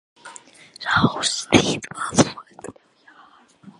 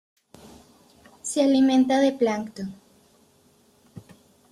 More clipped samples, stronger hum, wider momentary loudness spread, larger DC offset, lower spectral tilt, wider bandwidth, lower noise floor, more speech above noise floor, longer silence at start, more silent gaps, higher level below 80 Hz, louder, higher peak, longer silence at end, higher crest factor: neither; neither; first, 23 LU vs 17 LU; neither; about the same, -3.5 dB/octave vs -4.5 dB/octave; about the same, 11.5 kHz vs 12.5 kHz; second, -52 dBFS vs -60 dBFS; second, 31 dB vs 39 dB; second, 0.25 s vs 1.25 s; neither; first, -50 dBFS vs -68 dBFS; about the same, -20 LUFS vs -22 LUFS; first, 0 dBFS vs -10 dBFS; second, 0.1 s vs 0.5 s; first, 24 dB vs 16 dB